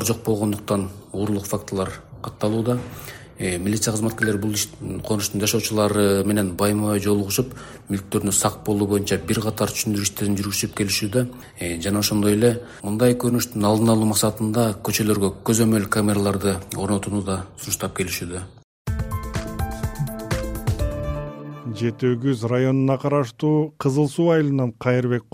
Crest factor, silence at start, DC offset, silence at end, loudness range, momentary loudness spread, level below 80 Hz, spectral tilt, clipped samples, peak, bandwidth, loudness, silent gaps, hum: 18 dB; 0 s; under 0.1%; 0.1 s; 7 LU; 10 LU; -40 dBFS; -5 dB/octave; under 0.1%; -4 dBFS; 17 kHz; -22 LUFS; 18.64-18.85 s; none